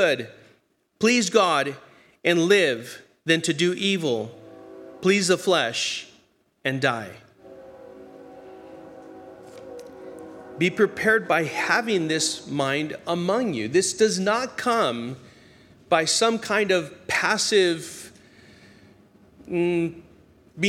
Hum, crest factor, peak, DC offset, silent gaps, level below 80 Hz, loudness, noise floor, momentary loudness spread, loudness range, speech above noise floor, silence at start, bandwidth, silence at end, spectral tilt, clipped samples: none; 20 dB; -4 dBFS; under 0.1%; none; -66 dBFS; -23 LUFS; -63 dBFS; 24 LU; 10 LU; 41 dB; 0 s; 16 kHz; 0 s; -3.5 dB/octave; under 0.1%